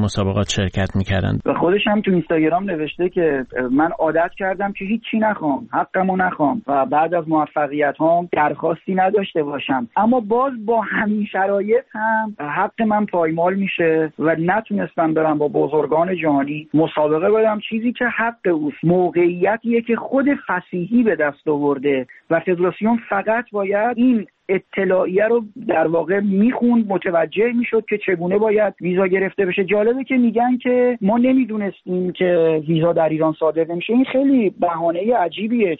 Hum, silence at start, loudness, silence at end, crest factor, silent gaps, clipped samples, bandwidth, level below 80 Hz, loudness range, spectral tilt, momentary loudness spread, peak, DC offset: none; 0 s; -18 LUFS; 0.05 s; 14 dB; none; under 0.1%; 8 kHz; -50 dBFS; 2 LU; -5.5 dB/octave; 5 LU; -4 dBFS; under 0.1%